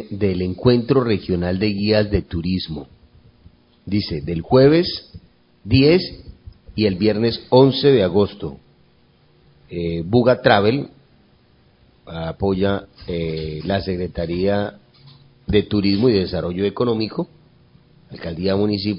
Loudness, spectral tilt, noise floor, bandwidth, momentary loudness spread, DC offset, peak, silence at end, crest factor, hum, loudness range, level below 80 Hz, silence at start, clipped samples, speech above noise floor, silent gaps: -19 LUFS; -11 dB/octave; -55 dBFS; 5.4 kHz; 16 LU; under 0.1%; 0 dBFS; 0 s; 20 dB; none; 6 LU; -40 dBFS; 0 s; under 0.1%; 37 dB; none